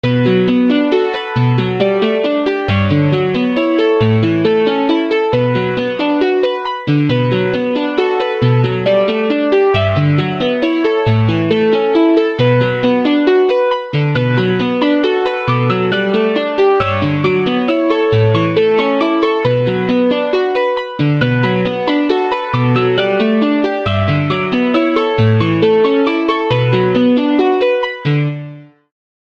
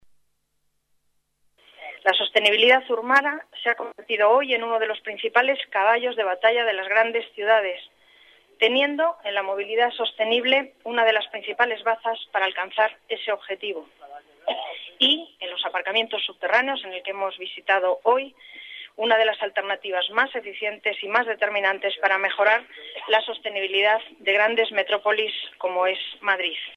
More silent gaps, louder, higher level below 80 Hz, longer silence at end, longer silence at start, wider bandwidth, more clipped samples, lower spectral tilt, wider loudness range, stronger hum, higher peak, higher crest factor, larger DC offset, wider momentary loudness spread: neither; first, -14 LUFS vs -22 LUFS; first, -46 dBFS vs -78 dBFS; first, 0.55 s vs 0 s; second, 0.05 s vs 1.8 s; second, 7 kHz vs 9.8 kHz; neither; first, -8.5 dB/octave vs -2.5 dB/octave; about the same, 2 LU vs 4 LU; neither; first, 0 dBFS vs -6 dBFS; second, 12 dB vs 18 dB; neither; second, 4 LU vs 10 LU